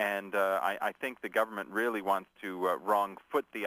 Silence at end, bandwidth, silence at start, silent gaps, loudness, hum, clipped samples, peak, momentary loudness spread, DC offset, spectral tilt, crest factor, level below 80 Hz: 0 s; 15.5 kHz; 0 s; none; -32 LUFS; none; under 0.1%; -14 dBFS; 5 LU; under 0.1%; -4 dB/octave; 18 dB; -78 dBFS